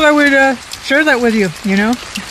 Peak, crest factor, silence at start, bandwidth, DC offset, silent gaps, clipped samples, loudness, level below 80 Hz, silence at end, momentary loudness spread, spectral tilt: 0 dBFS; 12 dB; 0 s; 13.5 kHz; under 0.1%; none; under 0.1%; -12 LUFS; -44 dBFS; 0 s; 8 LU; -4.5 dB/octave